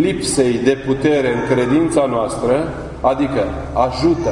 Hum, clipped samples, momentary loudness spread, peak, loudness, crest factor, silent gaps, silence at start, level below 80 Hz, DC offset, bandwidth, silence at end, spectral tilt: none; under 0.1%; 4 LU; -2 dBFS; -17 LUFS; 14 dB; none; 0 s; -36 dBFS; under 0.1%; 11 kHz; 0 s; -5.5 dB/octave